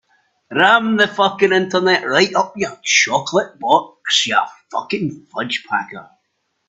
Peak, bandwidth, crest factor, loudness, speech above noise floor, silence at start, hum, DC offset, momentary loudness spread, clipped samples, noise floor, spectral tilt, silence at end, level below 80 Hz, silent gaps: 0 dBFS; 8.4 kHz; 18 dB; -16 LUFS; 53 dB; 0.5 s; none; under 0.1%; 11 LU; under 0.1%; -70 dBFS; -2.5 dB/octave; 0.65 s; -62 dBFS; none